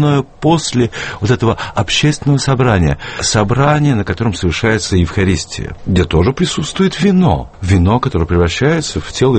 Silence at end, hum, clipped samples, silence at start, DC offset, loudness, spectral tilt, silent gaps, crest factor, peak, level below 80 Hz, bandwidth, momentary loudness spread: 0 s; none; under 0.1%; 0 s; under 0.1%; -14 LUFS; -5.5 dB/octave; none; 12 dB; 0 dBFS; -28 dBFS; 8.8 kHz; 5 LU